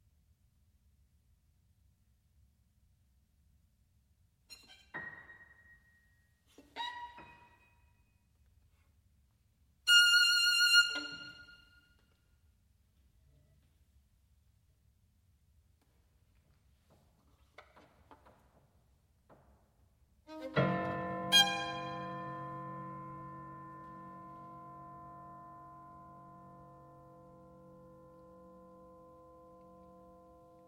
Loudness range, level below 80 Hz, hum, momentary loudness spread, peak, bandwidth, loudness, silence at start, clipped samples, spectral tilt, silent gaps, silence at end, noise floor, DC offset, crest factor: 25 LU; -70 dBFS; none; 29 LU; -14 dBFS; 16.5 kHz; -29 LUFS; 4.5 s; under 0.1%; -1.5 dB/octave; none; 4.05 s; -72 dBFS; under 0.1%; 26 dB